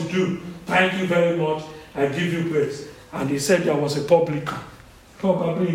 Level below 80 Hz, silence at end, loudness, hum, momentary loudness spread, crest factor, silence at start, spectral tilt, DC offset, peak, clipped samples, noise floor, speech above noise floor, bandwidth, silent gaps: -54 dBFS; 0 s; -22 LUFS; none; 12 LU; 20 dB; 0 s; -5.5 dB/octave; under 0.1%; -2 dBFS; under 0.1%; -46 dBFS; 24 dB; 16 kHz; none